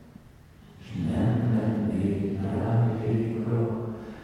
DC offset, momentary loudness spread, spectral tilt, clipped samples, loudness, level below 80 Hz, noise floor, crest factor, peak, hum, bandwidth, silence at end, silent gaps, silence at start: under 0.1%; 7 LU; -9.5 dB/octave; under 0.1%; -27 LUFS; -52 dBFS; -51 dBFS; 14 dB; -14 dBFS; none; 10 kHz; 0 s; none; 0 s